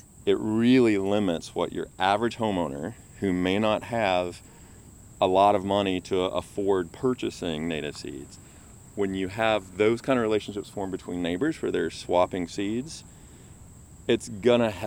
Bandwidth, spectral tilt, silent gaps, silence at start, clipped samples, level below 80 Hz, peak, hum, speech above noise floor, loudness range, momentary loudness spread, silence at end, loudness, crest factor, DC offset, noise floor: 16.5 kHz; -5.5 dB/octave; none; 0.15 s; under 0.1%; -54 dBFS; -6 dBFS; none; 23 dB; 4 LU; 14 LU; 0 s; -26 LUFS; 20 dB; under 0.1%; -49 dBFS